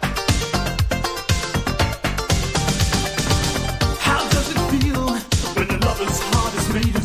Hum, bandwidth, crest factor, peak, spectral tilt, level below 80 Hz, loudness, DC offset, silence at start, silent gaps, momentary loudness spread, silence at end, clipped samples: none; 16 kHz; 16 dB; -4 dBFS; -4 dB/octave; -26 dBFS; -20 LUFS; under 0.1%; 0 s; none; 3 LU; 0 s; under 0.1%